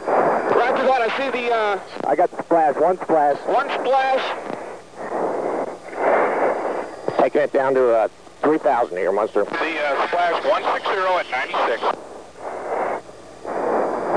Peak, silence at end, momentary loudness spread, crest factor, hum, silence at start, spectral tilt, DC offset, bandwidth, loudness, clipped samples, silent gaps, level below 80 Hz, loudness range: -6 dBFS; 0 s; 11 LU; 14 dB; none; 0 s; -5 dB/octave; 0.4%; 10.5 kHz; -20 LUFS; under 0.1%; none; -64 dBFS; 4 LU